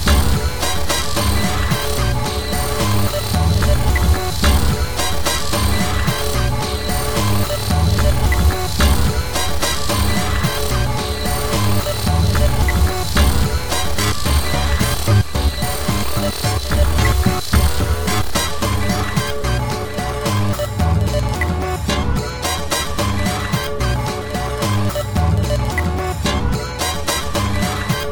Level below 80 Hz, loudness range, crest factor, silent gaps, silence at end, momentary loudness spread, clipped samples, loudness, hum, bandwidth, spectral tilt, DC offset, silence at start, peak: -22 dBFS; 2 LU; 16 dB; none; 0 s; 4 LU; under 0.1%; -18 LUFS; none; over 20 kHz; -4.5 dB/octave; 6%; 0 s; 0 dBFS